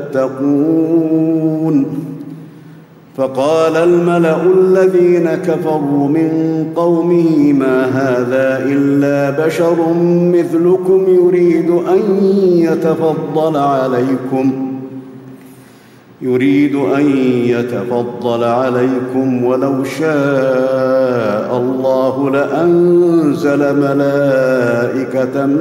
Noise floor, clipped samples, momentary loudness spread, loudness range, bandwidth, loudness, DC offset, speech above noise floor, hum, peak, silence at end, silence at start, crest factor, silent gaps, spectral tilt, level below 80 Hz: -41 dBFS; under 0.1%; 6 LU; 4 LU; 13.5 kHz; -13 LUFS; under 0.1%; 29 dB; none; -2 dBFS; 0 s; 0 s; 10 dB; none; -8 dB/octave; -58 dBFS